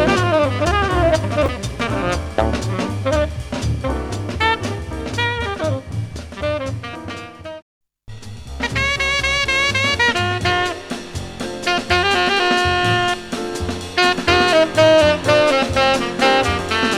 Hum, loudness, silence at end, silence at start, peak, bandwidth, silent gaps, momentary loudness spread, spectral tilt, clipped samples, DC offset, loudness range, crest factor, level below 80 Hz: none; -18 LUFS; 0 s; 0 s; -2 dBFS; 15 kHz; 7.62-7.81 s; 14 LU; -4.5 dB/octave; under 0.1%; under 0.1%; 9 LU; 16 dB; -32 dBFS